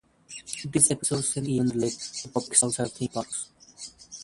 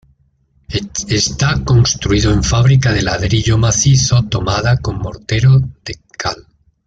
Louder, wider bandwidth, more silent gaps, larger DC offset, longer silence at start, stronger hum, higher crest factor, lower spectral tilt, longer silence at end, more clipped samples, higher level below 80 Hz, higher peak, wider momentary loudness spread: second, -25 LUFS vs -14 LUFS; first, 11.5 kHz vs 7.8 kHz; neither; neither; second, 0.3 s vs 0.7 s; neither; first, 26 dB vs 12 dB; about the same, -3.5 dB/octave vs -4.5 dB/octave; second, 0 s vs 0.45 s; neither; second, -60 dBFS vs -28 dBFS; about the same, -4 dBFS vs -2 dBFS; first, 21 LU vs 12 LU